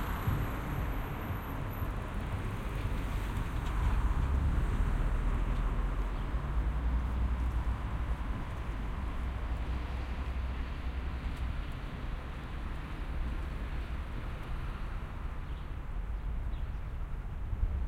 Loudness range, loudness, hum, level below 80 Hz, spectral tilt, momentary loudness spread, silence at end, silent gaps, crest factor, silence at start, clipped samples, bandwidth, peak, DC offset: 6 LU; -37 LUFS; none; -34 dBFS; -7 dB/octave; 8 LU; 0 s; none; 14 dB; 0 s; under 0.1%; 13.5 kHz; -18 dBFS; under 0.1%